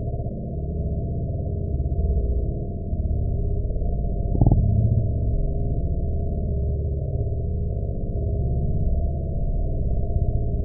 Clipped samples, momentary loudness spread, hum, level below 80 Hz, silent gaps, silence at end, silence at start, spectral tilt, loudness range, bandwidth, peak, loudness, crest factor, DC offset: under 0.1%; 7 LU; none; -26 dBFS; none; 0 s; 0 s; -19 dB/octave; 3 LU; 0.9 kHz; -6 dBFS; -26 LUFS; 16 dB; under 0.1%